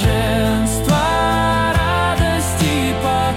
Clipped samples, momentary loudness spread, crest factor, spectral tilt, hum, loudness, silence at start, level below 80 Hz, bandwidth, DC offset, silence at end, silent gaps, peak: under 0.1%; 2 LU; 10 dB; -5 dB/octave; none; -16 LUFS; 0 s; -26 dBFS; 17 kHz; under 0.1%; 0 s; none; -6 dBFS